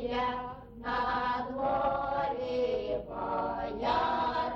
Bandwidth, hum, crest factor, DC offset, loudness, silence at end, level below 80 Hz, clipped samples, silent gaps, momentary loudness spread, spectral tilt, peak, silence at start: 7 kHz; none; 14 dB; under 0.1%; -32 LUFS; 0 s; -52 dBFS; under 0.1%; none; 6 LU; -6.5 dB/octave; -18 dBFS; 0 s